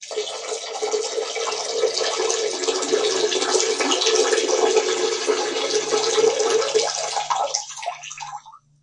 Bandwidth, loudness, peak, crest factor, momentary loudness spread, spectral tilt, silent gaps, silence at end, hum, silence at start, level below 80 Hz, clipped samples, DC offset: 11 kHz; -21 LUFS; -2 dBFS; 20 dB; 10 LU; 0 dB/octave; none; 0.25 s; none; 0 s; -72 dBFS; under 0.1%; under 0.1%